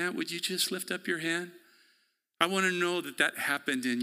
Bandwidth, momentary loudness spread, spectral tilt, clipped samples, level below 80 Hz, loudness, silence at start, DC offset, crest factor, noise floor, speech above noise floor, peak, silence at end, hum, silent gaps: 16 kHz; 6 LU; -2.5 dB/octave; under 0.1%; -80 dBFS; -30 LUFS; 0 s; under 0.1%; 26 dB; -72 dBFS; 41 dB; -6 dBFS; 0 s; none; none